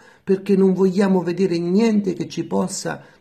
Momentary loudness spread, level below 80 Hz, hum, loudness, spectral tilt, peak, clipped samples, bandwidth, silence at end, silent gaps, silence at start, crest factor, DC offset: 9 LU; -64 dBFS; none; -19 LUFS; -6.5 dB/octave; -6 dBFS; under 0.1%; 13 kHz; 0.2 s; none; 0.25 s; 12 dB; under 0.1%